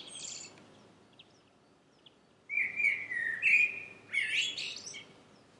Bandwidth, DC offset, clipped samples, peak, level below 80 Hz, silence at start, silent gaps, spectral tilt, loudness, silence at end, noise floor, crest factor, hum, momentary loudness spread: 11.5 kHz; under 0.1%; under 0.1%; -14 dBFS; -82 dBFS; 0 s; none; 0.5 dB/octave; -30 LUFS; 0.5 s; -65 dBFS; 20 dB; none; 20 LU